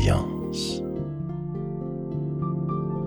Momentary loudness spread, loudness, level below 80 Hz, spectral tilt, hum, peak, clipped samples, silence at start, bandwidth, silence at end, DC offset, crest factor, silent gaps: 5 LU; -29 LUFS; -40 dBFS; -6.5 dB/octave; none; -10 dBFS; under 0.1%; 0 s; 20 kHz; 0 s; under 0.1%; 18 dB; none